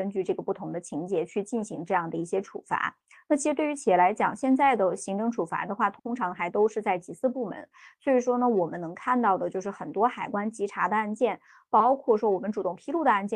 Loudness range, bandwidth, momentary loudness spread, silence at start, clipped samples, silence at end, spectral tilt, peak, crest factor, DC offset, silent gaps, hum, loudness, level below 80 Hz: 4 LU; 11 kHz; 10 LU; 0 s; under 0.1%; 0 s; -5.5 dB/octave; -10 dBFS; 18 dB; under 0.1%; none; none; -27 LUFS; -72 dBFS